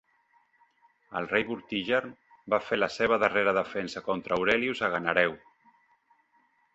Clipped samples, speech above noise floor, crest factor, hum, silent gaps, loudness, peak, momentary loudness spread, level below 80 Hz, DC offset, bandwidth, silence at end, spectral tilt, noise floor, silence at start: under 0.1%; 40 dB; 24 dB; none; none; -28 LUFS; -6 dBFS; 9 LU; -64 dBFS; under 0.1%; 8.2 kHz; 1.4 s; -5 dB/octave; -68 dBFS; 1.1 s